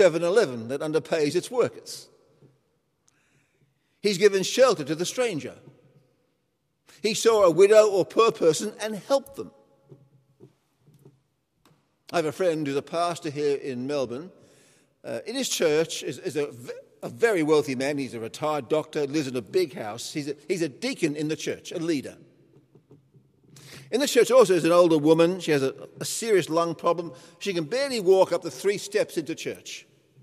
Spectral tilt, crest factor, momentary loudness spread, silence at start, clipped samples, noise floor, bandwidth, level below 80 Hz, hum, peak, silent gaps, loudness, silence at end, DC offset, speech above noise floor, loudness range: -4.5 dB/octave; 20 dB; 15 LU; 0 s; under 0.1%; -74 dBFS; 15 kHz; -74 dBFS; none; -4 dBFS; none; -24 LUFS; 0.4 s; under 0.1%; 50 dB; 9 LU